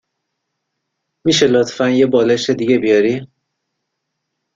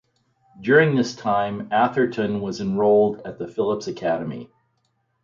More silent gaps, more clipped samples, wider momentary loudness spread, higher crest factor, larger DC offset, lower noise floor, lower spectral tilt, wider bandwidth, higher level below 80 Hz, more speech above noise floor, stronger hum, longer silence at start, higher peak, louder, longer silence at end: neither; neither; second, 6 LU vs 14 LU; about the same, 16 dB vs 18 dB; neither; first, -75 dBFS vs -70 dBFS; second, -4.5 dB/octave vs -6.5 dB/octave; about the same, 7.8 kHz vs 7.4 kHz; about the same, -56 dBFS vs -60 dBFS; first, 61 dB vs 49 dB; neither; first, 1.25 s vs 0.6 s; about the same, -2 dBFS vs -4 dBFS; first, -14 LUFS vs -21 LUFS; first, 1.3 s vs 0.8 s